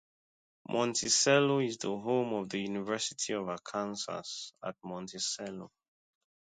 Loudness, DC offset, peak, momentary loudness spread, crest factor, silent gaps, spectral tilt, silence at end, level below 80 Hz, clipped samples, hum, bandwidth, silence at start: -32 LUFS; under 0.1%; -12 dBFS; 16 LU; 22 dB; none; -3 dB/octave; 0.8 s; -74 dBFS; under 0.1%; none; 9.6 kHz; 0.7 s